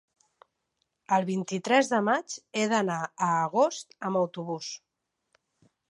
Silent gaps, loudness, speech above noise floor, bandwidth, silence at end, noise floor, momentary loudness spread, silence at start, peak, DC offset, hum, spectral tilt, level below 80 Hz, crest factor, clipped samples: none; -28 LUFS; 52 dB; 11.5 kHz; 1.15 s; -79 dBFS; 11 LU; 1.1 s; -8 dBFS; under 0.1%; none; -4.5 dB/octave; -80 dBFS; 22 dB; under 0.1%